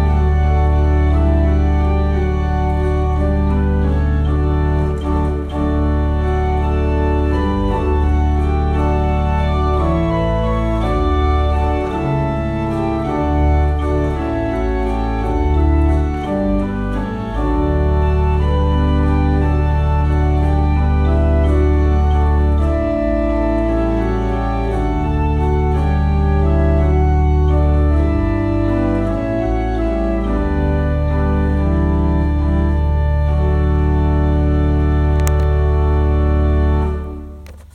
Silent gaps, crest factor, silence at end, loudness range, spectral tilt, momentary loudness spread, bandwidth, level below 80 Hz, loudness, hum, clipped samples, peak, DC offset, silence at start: none; 14 dB; 0.1 s; 2 LU; -9 dB/octave; 4 LU; 6.2 kHz; -18 dBFS; -17 LUFS; none; under 0.1%; 0 dBFS; under 0.1%; 0 s